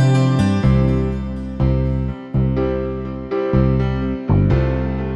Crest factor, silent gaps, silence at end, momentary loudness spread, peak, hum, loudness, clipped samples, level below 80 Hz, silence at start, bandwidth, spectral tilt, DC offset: 14 dB; none; 0 s; 8 LU; -2 dBFS; none; -19 LUFS; under 0.1%; -26 dBFS; 0 s; 8.6 kHz; -8.5 dB/octave; under 0.1%